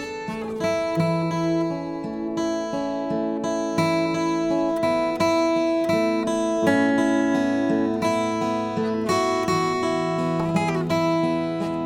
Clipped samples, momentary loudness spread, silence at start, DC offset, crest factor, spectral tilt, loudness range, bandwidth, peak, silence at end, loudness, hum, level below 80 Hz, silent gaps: under 0.1%; 6 LU; 0 s; under 0.1%; 16 dB; -6 dB/octave; 4 LU; 15.5 kHz; -6 dBFS; 0 s; -23 LUFS; none; -54 dBFS; none